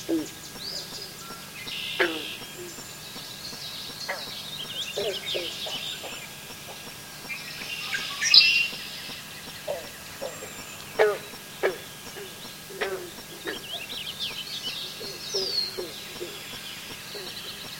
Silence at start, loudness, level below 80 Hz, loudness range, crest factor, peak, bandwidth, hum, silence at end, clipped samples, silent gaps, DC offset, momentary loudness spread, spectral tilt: 0 s; -28 LUFS; -62 dBFS; 10 LU; 30 dB; 0 dBFS; 17 kHz; none; 0 s; under 0.1%; none; under 0.1%; 13 LU; -1.5 dB/octave